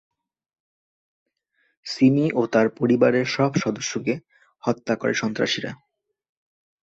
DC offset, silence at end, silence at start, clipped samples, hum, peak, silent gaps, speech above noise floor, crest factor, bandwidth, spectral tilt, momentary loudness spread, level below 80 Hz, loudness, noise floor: under 0.1%; 1.2 s; 1.85 s; under 0.1%; none; -6 dBFS; none; 48 dB; 20 dB; 7.8 kHz; -5.5 dB/octave; 11 LU; -64 dBFS; -22 LUFS; -70 dBFS